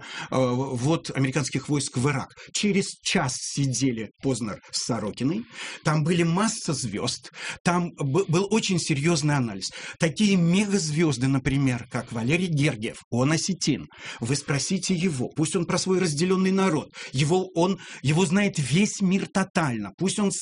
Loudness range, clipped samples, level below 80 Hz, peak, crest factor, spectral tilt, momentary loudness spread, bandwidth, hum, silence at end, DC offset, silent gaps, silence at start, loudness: 3 LU; under 0.1%; -54 dBFS; -8 dBFS; 16 dB; -5 dB/octave; 7 LU; 11 kHz; none; 0 s; under 0.1%; 7.60-7.65 s, 13.04-13.11 s, 19.50-19.54 s, 19.94-19.98 s; 0 s; -25 LUFS